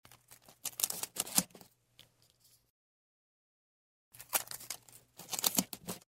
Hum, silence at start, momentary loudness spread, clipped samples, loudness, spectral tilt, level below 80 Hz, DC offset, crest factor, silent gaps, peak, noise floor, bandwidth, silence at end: none; 0.3 s; 18 LU; under 0.1%; -35 LUFS; -1 dB/octave; -74 dBFS; under 0.1%; 36 dB; 2.70-4.11 s; -4 dBFS; -69 dBFS; 16 kHz; 0.1 s